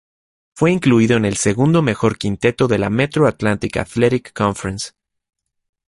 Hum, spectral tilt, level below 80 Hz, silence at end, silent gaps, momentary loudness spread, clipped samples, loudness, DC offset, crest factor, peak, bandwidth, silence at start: none; -6 dB/octave; -44 dBFS; 1 s; none; 8 LU; under 0.1%; -17 LUFS; under 0.1%; 16 dB; -2 dBFS; 11.5 kHz; 0.55 s